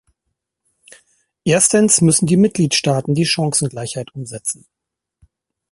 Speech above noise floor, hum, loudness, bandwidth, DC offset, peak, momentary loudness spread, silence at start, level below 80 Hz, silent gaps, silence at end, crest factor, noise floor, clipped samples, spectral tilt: 60 dB; none; -15 LUFS; 12 kHz; under 0.1%; 0 dBFS; 15 LU; 1.45 s; -54 dBFS; none; 1.2 s; 18 dB; -76 dBFS; under 0.1%; -4 dB/octave